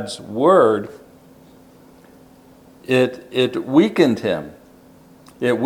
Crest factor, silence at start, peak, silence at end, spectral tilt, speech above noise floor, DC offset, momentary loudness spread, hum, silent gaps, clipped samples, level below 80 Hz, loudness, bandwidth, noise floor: 20 dB; 0 s; -2 dBFS; 0 s; -6 dB/octave; 30 dB; under 0.1%; 14 LU; none; none; under 0.1%; -62 dBFS; -18 LUFS; 17.5 kHz; -47 dBFS